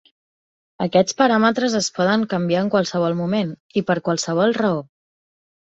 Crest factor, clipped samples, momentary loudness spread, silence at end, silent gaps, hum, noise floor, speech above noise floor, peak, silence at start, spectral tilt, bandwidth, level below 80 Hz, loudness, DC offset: 18 dB; under 0.1%; 7 LU; 0.75 s; 3.60-3.70 s; none; under -90 dBFS; over 71 dB; -2 dBFS; 0.8 s; -5 dB/octave; 8 kHz; -62 dBFS; -20 LUFS; under 0.1%